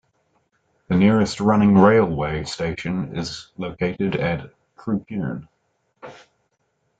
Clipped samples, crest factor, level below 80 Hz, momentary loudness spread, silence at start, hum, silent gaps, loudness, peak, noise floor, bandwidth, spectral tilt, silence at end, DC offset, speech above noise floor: under 0.1%; 20 dB; -48 dBFS; 18 LU; 0.9 s; none; none; -20 LUFS; -2 dBFS; -70 dBFS; 8.8 kHz; -7 dB/octave; 0.85 s; under 0.1%; 50 dB